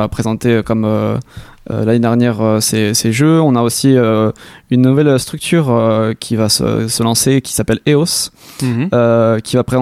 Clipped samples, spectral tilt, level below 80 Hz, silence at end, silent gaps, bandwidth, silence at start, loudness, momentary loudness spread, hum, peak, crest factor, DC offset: under 0.1%; -5 dB/octave; -42 dBFS; 0 s; none; 16 kHz; 0 s; -13 LUFS; 6 LU; none; 0 dBFS; 12 dB; under 0.1%